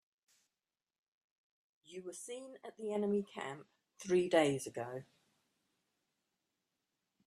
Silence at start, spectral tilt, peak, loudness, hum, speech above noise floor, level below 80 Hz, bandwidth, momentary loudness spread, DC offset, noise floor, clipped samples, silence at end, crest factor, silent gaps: 1.9 s; -5 dB/octave; -18 dBFS; -37 LUFS; none; over 53 dB; -82 dBFS; 13 kHz; 19 LU; under 0.1%; under -90 dBFS; under 0.1%; 2.25 s; 24 dB; none